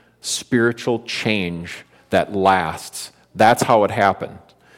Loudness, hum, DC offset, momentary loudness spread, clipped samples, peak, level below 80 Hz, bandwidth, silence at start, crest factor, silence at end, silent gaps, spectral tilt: -18 LUFS; none; under 0.1%; 17 LU; under 0.1%; -2 dBFS; -54 dBFS; 16.5 kHz; 0.25 s; 18 dB; 0.4 s; none; -4.5 dB/octave